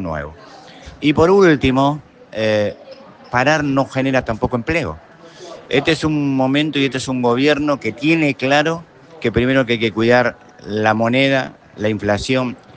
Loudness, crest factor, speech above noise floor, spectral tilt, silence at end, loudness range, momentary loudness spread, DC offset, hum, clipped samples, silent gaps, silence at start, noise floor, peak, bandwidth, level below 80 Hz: -17 LUFS; 16 dB; 23 dB; -6 dB/octave; 0.2 s; 3 LU; 13 LU; under 0.1%; none; under 0.1%; none; 0 s; -39 dBFS; 0 dBFS; 9.4 kHz; -44 dBFS